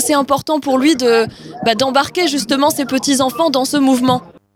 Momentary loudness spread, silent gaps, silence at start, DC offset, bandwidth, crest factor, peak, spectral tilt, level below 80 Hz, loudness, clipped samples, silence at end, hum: 4 LU; none; 0 s; under 0.1%; 17.5 kHz; 14 dB; 0 dBFS; -3.5 dB/octave; -54 dBFS; -15 LUFS; under 0.1%; 0.3 s; none